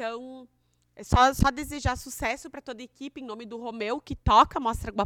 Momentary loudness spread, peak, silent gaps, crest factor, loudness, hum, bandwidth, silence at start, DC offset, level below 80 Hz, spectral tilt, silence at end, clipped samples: 20 LU; -4 dBFS; none; 24 dB; -25 LUFS; 60 Hz at -55 dBFS; 18 kHz; 0 s; under 0.1%; -38 dBFS; -5 dB/octave; 0 s; under 0.1%